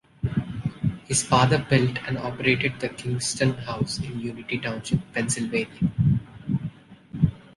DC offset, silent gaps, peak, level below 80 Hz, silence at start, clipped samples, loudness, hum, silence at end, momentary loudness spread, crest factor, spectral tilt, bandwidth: under 0.1%; none; -4 dBFS; -46 dBFS; 0.25 s; under 0.1%; -25 LUFS; none; 0.15 s; 10 LU; 20 dB; -5 dB/octave; 11.5 kHz